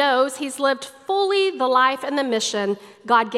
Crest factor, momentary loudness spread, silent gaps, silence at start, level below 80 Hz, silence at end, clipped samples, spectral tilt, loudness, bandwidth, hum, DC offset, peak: 16 dB; 7 LU; none; 0 s; -76 dBFS; 0 s; under 0.1%; -2.5 dB/octave; -21 LUFS; 13.5 kHz; none; under 0.1%; -4 dBFS